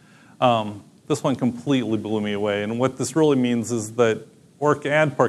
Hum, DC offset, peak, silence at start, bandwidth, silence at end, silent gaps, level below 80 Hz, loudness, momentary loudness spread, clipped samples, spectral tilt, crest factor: none; under 0.1%; -4 dBFS; 0.4 s; 13 kHz; 0 s; none; -66 dBFS; -22 LUFS; 6 LU; under 0.1%; -5.5 dB/octave; 18 dB